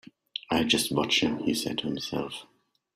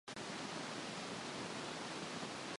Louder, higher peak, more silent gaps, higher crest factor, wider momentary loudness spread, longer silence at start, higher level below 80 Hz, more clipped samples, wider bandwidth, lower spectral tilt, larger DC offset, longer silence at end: first, -27 LUFS vs -45 LUFS; first, -10 dBFS vs -32 dBFS; neither; first, 20 dB vs 14 dB; first, 15 LU vs 0 LU; first, 0.5 s vs 0.05 s; first, -60 dBFS vs -78 dBFS; neither; first, 16 kHz vs 11.5 kHz; about the same, -3.5 dB/octave vs -3 dB/octave; neither; first, 0.5 s vs 0 s